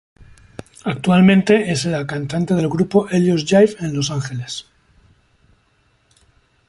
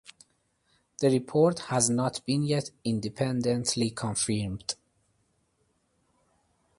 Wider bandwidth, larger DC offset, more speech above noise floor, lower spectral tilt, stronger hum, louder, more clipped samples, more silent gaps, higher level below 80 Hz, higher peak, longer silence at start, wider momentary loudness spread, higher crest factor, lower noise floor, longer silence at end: about the same, 11.5 kHz vs 11.5 kHz; neither; about the same, 44 dB vs 45 dB; about the same, -6 dB/octave vs -5 dB/octave; neither; first, -17 LUFS vs -28 LUFS; neither; neither; first, -52 dBFS vs -60 dBFS; first, 0 dBFS vs -8 dBFS; second, 0.85 s vs 1 s; first, 15 LU vs 7 LU; about the same, 18 dB vs 22 dB; second, -60 dBFS vs -72 dBFS; about the same, 2.05 s vs 2.05 s